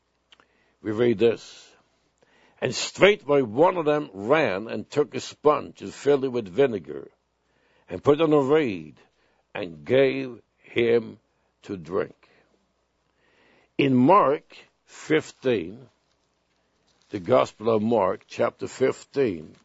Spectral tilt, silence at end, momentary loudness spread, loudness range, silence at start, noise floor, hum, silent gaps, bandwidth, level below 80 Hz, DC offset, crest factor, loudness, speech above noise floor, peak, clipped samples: -5.5 dB/octave; 0.15 s; 17 LU; 5 LU; 0.85 s; -71 dBFS; none; none; 8 kHz; -64 dBFS; under 0.1%; 24 dB; -23 LUFS; 48 dB; 0 dBFS; under 0.1%